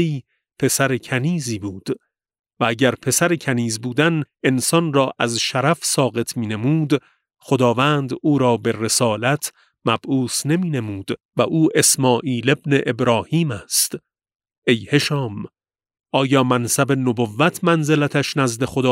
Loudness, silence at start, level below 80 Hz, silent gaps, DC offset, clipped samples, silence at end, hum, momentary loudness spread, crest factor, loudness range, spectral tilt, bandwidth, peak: -19 LUFS; 0 s; -60 dBFS; 2.39-2.44 s, 11.25-11.29 s, 14.35-14.39 s, 14.58-14.62 s; under 0.1%; under 0.1%; 0 s; none; 8 LU; 18 dB; 2 LU; -4.5 dB/octave; 16 kHz; -2 dBFS